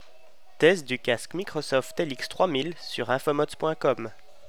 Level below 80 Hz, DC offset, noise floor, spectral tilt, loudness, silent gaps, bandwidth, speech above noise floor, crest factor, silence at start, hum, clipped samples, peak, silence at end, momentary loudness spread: -64 dBFS; 0.8%; -58 dBFS; -4.5 dB/octave; -27 LUFS; none; 17 kHz; 31 dB; 22 dB; 0.6 s; none; under 0.1%; -6 dBFS; 0.4 s; 10 LU